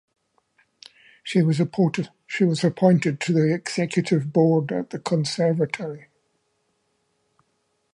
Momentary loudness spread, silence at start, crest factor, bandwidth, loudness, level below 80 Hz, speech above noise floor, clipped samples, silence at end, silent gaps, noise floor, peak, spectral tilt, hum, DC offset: 11 LU; 1.25 s; 20 dB; 11 kHz; -22 LUFS; -70 dBFS; 50 dB; under 0.1%; 1.95 s; none; -71 dBFS; -4 dBFS; -6.5 dB/octave; none; under 0.1%